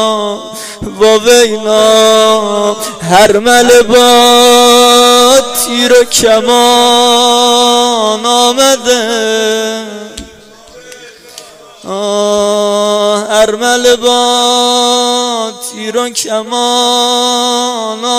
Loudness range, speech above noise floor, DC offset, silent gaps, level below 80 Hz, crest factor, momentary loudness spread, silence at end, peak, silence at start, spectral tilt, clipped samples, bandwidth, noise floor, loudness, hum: 9 LU; 27 dB; under 0.1%; none; -44 dBFS; 8 dB; 12 LU; 0 s; 0 dBFS; 0 s; -1.5 dB/octave; 0.7%; 16.5 kHz; -35 dBFS; -7 LUFS; none